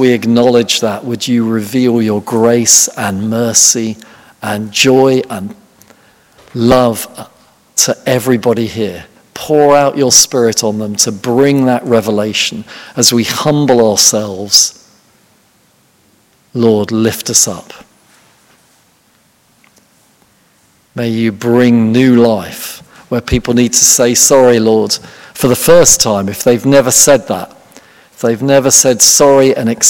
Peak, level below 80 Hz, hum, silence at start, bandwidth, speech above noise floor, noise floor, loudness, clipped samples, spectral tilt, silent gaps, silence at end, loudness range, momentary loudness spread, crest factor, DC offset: 0 dBFS; -40 dBFS; none; 0 s; over 20 kHz; 42 dB; -52 dBFS; -9 LUFS; 1%; -3 dB/octave; none; 0 s; 7 LU; 15 LU; 12 dB; under 0.1%